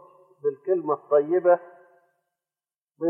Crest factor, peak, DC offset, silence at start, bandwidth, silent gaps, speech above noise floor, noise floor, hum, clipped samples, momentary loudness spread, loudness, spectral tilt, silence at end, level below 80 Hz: 18 dB; -8 dBFS; under 0.1%; 0.45 s; 3.2 kHz; 2.81-2.88 s; over 67 dB; under -90 dBFS; none; under 0.1%; 9 LU; -24 LUFS; -11 dB/octave; 0 s; under -90 dBFS